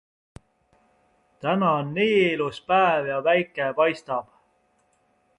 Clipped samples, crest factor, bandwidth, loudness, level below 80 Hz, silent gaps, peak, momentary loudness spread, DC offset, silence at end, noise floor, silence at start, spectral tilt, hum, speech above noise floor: under 0.1%; 18 dB; 11 kHz; -23 LUFS; -64 dBFS; none; -8 dBFS; 10 LU; under 0.1%; 1.15 s; -66 dBFS; 1.45 s; -6.5 dB/octave; none; 44 dB